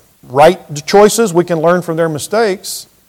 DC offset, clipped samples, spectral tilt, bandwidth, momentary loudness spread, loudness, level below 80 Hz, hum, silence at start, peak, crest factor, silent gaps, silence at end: under 0.1%; 2%; -4.5 dB/octave; 17.5 kHz; 11 LU; -12 LUFS; -48 dBFS; none; 0.3 s; 0 dBFS; 12 dB; none; 0.25 s